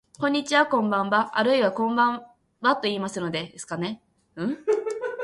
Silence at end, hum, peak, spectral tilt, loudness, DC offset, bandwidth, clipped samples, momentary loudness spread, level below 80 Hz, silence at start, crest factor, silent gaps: 0 s; none; -6 dBFS; -4.5 dB/octave; -24 LUFS; under 0.1%; 11.5 kHz; under 0.1%; 11 LU; -68 dBFS; 0.2 s; 18 dB; none